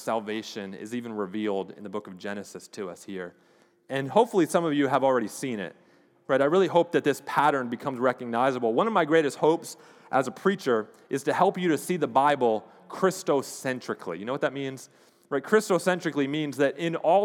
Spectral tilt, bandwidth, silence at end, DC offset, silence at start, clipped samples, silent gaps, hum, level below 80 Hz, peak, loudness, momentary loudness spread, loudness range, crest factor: -5 dB/octave; 18 kHz; 0 s; under 0.1%; 0 s; under 0.1%; none; none; -86 dBFS; -6 dBFS; -26 LUFS; 14 LU; 6 LU; 20 dB